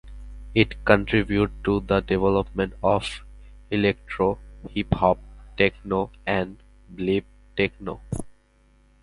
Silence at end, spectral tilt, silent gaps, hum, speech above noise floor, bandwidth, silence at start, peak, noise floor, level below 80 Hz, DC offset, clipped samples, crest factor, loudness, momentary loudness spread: 0.7 s; -7 dB/octave; none; 50 Hz at -40 dBFS; 35 dB; 11.5 kHz; 0.05 s; 0 dBFS; -59 dBFS; -40 dBFS; under 0.1%; under 0.1%; 24 dB; -24 LUFS; 13 LU